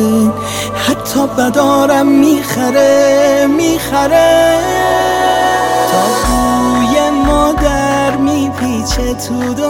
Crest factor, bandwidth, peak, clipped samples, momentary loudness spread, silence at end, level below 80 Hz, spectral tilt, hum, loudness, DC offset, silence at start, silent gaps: 10 dB; 17 kHz; 0 dBFS; under 0.1%; 7 LU; 0 s; -28 dBFS; -4.5 dB/octave; none; -11 LUFS; under 0.1%; 0 s; none